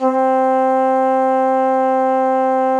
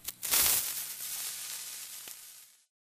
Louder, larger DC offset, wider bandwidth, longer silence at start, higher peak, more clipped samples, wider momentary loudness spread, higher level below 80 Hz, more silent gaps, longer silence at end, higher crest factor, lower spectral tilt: first, -15 LUFS vs -30 LUFS; neither; second, 8.8 kHz vs 16 kHz; about the same, 0 s vs 0 s; about the same, -4 dBFS vs -6 dBFS; neither; second, 1 LU vs 20 LU; second, -84 dBFS vs -64 dBFS; neither; second, 0 s vs 0.35 s; second, 10 dB vs 30 dB; first, -5 dB/octave vs 1.5 dB/octave